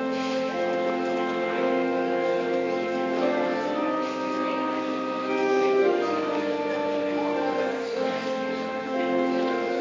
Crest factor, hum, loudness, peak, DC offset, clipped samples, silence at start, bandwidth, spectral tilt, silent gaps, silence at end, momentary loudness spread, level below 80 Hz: 14 dB; none; -26 LUFS; -12 dBFS; under 0.1%; under 0.1%; 0 s; 7.6 kHz; -5 dB/octave; none; 0 s; 5 LU; -68 dBFS